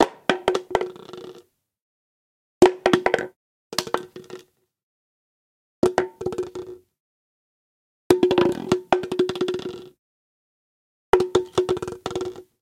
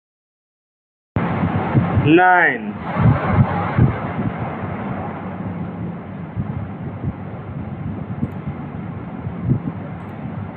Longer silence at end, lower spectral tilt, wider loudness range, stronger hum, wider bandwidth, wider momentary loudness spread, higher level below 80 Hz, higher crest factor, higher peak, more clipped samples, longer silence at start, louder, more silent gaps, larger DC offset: first, 0.2 s vs 0 s; second, -5 dB/octave vs -11 dB/octave; second, 6 LU vs 11 LU; neither; first, 16 kHz vs 4.3 kHz; first, 21 LU vs 15 LU; second, -54 dBFS vs -40 dBFS; about the same, 22 dB vs 18 dB; about the same, -2 dBFS vs -2 dBFS; neither; second, 0 s vs 1.15 s; about the same, -23 LUFS vs -21 LUFS; first, 1.82-2.61 s, 3.36-3.70 s, 4.83-5.82 s, 7.00-8.10 s, 9.99-11.13 s vs none; neither